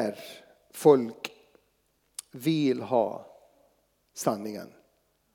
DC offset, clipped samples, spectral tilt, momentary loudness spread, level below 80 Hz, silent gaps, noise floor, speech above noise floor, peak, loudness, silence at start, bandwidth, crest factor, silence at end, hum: under 0.1%; under 0.1%; -5.5 dB/octave; 24 LU; -80 dBFS; none; -71 dBFS; 45 dB; -6 dBFS; -27 LUFS; 0 s; 19.5 kHz; 24 dB; 0.7 s; none